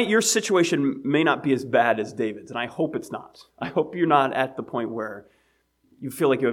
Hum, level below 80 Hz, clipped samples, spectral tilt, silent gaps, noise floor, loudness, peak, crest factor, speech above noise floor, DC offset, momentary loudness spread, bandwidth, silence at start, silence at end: none; -68 dBFS; under 0.1%; -4 dB/octave; none; -66 dBFS; -23 LUFS; -4 dBFS; 20 dB; 43 dB; under 0.1%; 15 LU; 17.5 kHz; 0 s; 0 s